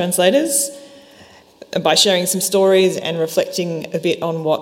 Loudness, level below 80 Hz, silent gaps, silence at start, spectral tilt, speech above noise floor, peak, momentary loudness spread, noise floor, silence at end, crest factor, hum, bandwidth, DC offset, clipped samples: -16 LUFS; -64 dBFS; none; 0 s; -3 dB/octave; 29 dB; 0 dBFS; 9 LU; -45 dBFS; 0 s; 16 dB; none; 16.5 kHz; under 0.1%; under 0.1%